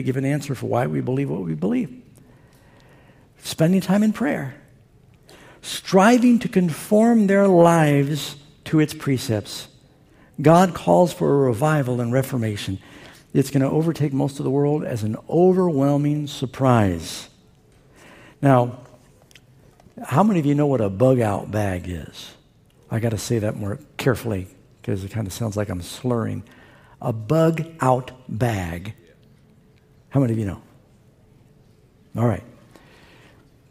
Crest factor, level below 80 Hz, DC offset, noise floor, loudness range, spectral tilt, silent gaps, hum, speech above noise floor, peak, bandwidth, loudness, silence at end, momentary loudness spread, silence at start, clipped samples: 20 dB; -56 dBFS; under 0.1%; -55 dBFS; 9 LU; -7 dB/octave; none; none; 35 dB; -2 dBFS; 16 kHz; -21 LUFS; 1.2 s; 16 LU; 0 s; under 0.1%